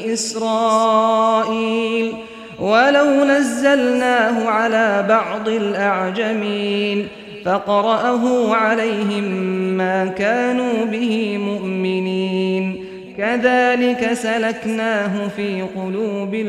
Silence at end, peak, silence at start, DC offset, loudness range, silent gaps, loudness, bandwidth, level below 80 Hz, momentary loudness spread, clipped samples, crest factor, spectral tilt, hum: 0 s; -2 dBFS; 0 s; under 0.1%; 4 LU; none; -18 LUFS; 14 kHz; -60 dBFS; 8 LU; under 0.1%; 16 dB; -5 dB/octave; none